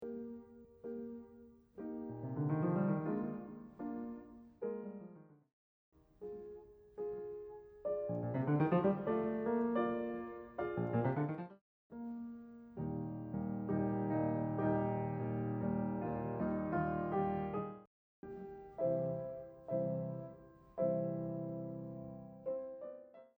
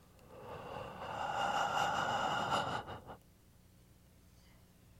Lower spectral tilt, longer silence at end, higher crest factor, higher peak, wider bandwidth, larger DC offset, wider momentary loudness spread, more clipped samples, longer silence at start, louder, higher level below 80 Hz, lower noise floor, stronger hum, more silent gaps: first, -11.5 dB/octave vs -3.5 dB/octave; about the same, 0.1 s vs 0 s; about the same, 18 dB vs 18 dB; about the same, -20 dBFS vs -22 dBFS; first, over 20 kHz vs 16.5 kHz; neither; second, 17 LU vs 20 LU; neither; second, 0 s vs 0.15 s; second, -40 LUFS vs -37 LUFS; about the same, -66 dBFS vs -64 dBFS; about the same, -61 dBFS vs -64 dBFS; neither; first, 5.53-5.92 s, 11.61-11.90 s, 17.87-18.23 s vs none